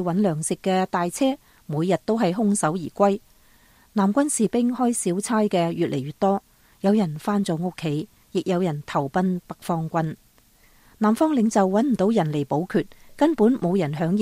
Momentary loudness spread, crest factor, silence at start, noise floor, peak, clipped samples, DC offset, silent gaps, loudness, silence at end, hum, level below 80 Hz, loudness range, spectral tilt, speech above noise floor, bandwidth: 8 LU; 16 dB; 0 s; -56 dBFS; -6 dBFS; under 0.1%; under 0.1%; none; -23 LUFS; 0 s; none; -58 dBFS; 4 LU; -6 dB/octave; 35 dB; 15.5 kHz